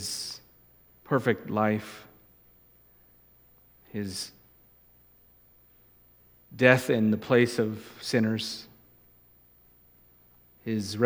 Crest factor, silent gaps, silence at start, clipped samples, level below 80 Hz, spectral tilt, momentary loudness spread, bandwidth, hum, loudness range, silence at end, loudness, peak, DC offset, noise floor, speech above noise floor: 28 dB; none; 0 s; under 0.1%; -68 dBFS; -5 dB/octave; 19 LU; over 20 kHz; 60 Hz at -65 dBFS; 16 LU; 0 s; -27 LUFS; -4 dBFS; under 0.1%; -60 dBFS; 34 dB